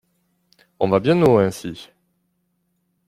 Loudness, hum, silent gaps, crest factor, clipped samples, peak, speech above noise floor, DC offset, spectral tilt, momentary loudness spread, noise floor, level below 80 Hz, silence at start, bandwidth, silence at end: -18 LUFS; none; none; 20 dB; under 0.1%; -2 dBFS; 52 dB; under 0.1%; -7 dB/octave; 18 LU; -70 dBFS; -56 dBFS; 0.8 s; 15 kHz; 1.25 s